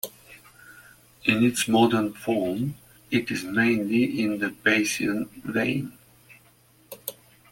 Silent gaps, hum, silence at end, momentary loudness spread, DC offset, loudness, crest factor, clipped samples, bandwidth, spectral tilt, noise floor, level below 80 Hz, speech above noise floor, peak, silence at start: none; none; 0.4 s; 16 LU; under 0.1%; -24 LUFS; 20 dB; under 0.1%; 17 kHz; -4.5 dB/octave; -58 dBFS; -62 dBFS; 34 dB; -6 dBFS; 0.05 s